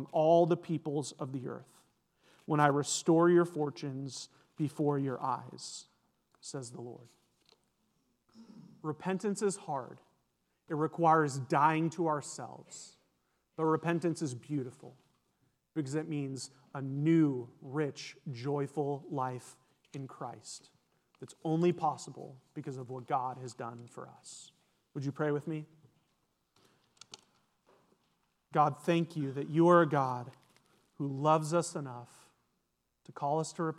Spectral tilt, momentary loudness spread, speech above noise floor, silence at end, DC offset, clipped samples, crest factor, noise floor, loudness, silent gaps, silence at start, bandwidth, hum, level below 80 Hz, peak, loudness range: -6 dB/octave; 21 LU; 48 dB; 0.05 s; under 0.1%; under 0.1%; 24 dB; -81 dBFS; -33 LUFS; none; 0 s; 12.5 kHz; none; -86 dBFS; -10 dBFS; 11 LU